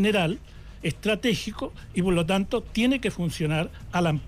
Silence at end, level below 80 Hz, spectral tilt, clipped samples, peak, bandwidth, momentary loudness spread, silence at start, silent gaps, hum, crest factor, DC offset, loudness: 0 s; -44 dBFS; -5.5 dB/octave; under 0.1%; -14 dBFS; 15.5 kHz; 9 LU; 0 s; none; none; 12 dB; under 0.1%; -26 LUFS